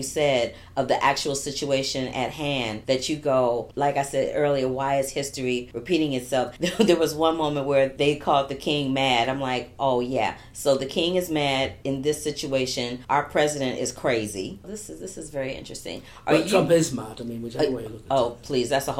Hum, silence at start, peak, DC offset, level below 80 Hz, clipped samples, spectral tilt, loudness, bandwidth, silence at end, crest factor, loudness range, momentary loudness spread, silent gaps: none; 0 s; -4 dBFS; under 0.1%; -52 dBFS; under 0.1%; -4.5 dB/octave; -24 LUFS; 16 kHz; 0 s; 20 dB; 3 LU; 11 LU; none